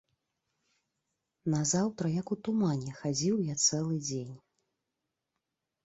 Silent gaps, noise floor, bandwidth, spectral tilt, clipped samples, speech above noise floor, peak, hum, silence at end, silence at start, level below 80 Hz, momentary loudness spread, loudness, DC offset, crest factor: none; -86 dBFS; 8 kHz; -4.5 dB/octave; under 0.1%; 55 dB; -14 dBFS; none; 1.5 s; 1.45 s; -70 dBFS; 9 LU; -31 LUFS; under 0.1%; 20 dB